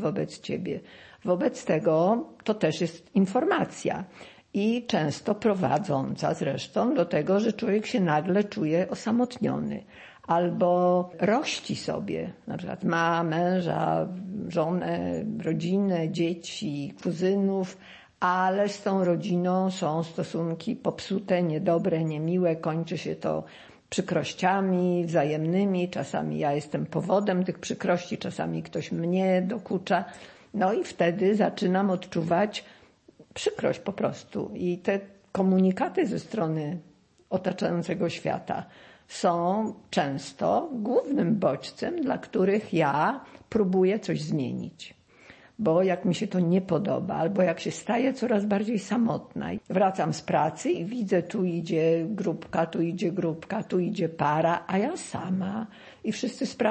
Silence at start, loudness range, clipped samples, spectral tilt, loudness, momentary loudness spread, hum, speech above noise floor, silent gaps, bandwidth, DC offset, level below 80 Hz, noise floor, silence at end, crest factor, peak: 0 s; 2 LU; under 0.1%; -6.5 dB/octave; -27 LUFS; 9 LU; none; 29 dB; none; 8.8 kHz; under 0.1%; -68 dBFS; -56 dBFS; 0 s; 16 dB; -10 dBFS